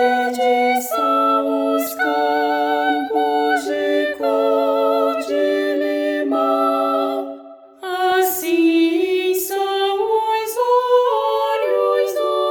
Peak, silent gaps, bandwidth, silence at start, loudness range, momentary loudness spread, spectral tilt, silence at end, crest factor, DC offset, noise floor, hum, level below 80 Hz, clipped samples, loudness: -4 dBFS; none; over 20 kHz; 0 s; 2 LU; 4 LU; -2 dB/octave; 0 s; 12 dB; under 0.1%; -39 dBFS; none; -66 dBFS; under 0.1%; -18 LUFS